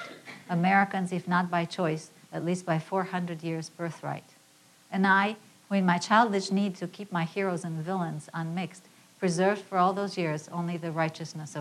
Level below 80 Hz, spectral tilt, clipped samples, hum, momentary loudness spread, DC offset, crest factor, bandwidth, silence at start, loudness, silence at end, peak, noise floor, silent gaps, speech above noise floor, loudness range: -78 dBFS; -6 dB/octave; under 0.1%; none; 14 LU; under 0.1%; 22 dB; 13 kHz; 0 s; -29 LUFS; 0 s; -8 dBFS; -59 dBFS; none; 31 dB; 5 LU